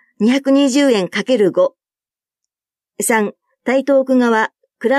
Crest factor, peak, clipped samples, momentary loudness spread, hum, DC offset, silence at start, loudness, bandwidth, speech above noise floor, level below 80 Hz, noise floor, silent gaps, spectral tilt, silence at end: 14 dB; -2 dBFS; under 0.1%; 9 LU; none; under 0.1%; 0.2 s; -15 LUFS; 15 kHz; over 76 dB; -72 dBFS; under -90 dBFS; none; -4 dB/octave; 0 s